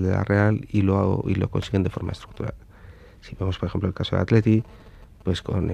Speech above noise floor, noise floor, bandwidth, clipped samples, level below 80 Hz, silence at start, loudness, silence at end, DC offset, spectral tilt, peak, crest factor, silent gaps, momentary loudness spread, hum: 23 dB; -46 dBFS; 8.8 kHz; under 0.1%; -44 dBFS; 0 s; -24 LUFS; 0 s; under 0.1%; -8 dB/octave; -4 dBFS; 20 dB; none; 13 LU; none